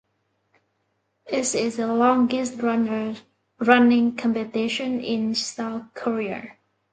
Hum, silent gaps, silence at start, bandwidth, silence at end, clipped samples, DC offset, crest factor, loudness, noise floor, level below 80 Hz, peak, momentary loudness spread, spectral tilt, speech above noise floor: none; none; 1.25 s; 9.4 kHz; 0.4 s; under 0.1%; under 0.1%; 24 dB; -23 LUFS; -72 dBFS; -68 dBFS; 0 dBFS; 13 LU; -4 dB/octave; 50 dB